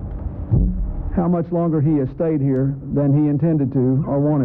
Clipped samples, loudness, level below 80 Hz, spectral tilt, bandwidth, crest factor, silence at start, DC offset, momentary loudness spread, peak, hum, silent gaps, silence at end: under 0.1%; -19 LUFS; -30 dBFS; -14 dB/octave; 2.8 kHz; 10 dB; 0 s; under 0.1%; 6 LU; -8 dBFS; none; none; 0 s